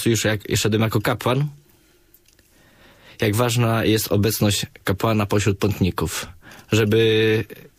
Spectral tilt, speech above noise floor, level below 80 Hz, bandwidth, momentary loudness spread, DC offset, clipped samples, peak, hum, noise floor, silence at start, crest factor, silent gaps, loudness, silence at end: -5 dB/octave; 36 dB; -46 dBFS; 15.5 kHz; 8 LU; under 0.1%; under 0.1%; -6 dBFS; none; -56 dBFS; 0 s; 14 dB; none; -20 LUFS; 0.2 s